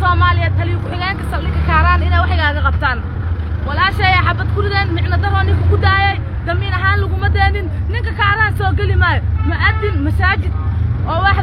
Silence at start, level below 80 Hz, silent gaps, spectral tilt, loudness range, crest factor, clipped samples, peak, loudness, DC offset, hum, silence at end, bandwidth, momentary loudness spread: 0 s; -20 dBFS; none; -7.5 dB/octave; 1 LU; 14 dB; under 0.1%; 0 dBFS; -15 LUFS; under 0.1%; none; 0 s; 5.4 kHz; 7 LU